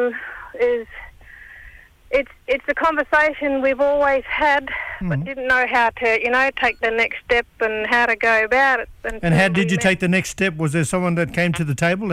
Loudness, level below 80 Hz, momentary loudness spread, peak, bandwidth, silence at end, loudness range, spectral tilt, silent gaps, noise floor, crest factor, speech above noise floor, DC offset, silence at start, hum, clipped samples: -19 LUFS; -44 dBFS; 8 LU; -4 dBFS; 15 kHz; 0 s; 3 LU; -5 dB/octave; none; -44 dBFS; 14 dB; 25 dB; under 0.1%; 0 s; none; under 0.1%